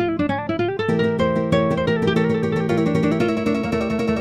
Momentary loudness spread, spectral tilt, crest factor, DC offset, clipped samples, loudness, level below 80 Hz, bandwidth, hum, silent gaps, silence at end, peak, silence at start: 3 LU; -7.5 dB/octave; 14 dB; under 0.1%; under 0.1%; -20 LUFS; -44 dBFS; 11 kHz; none; none; 0 s; -4 dBFS; 0 s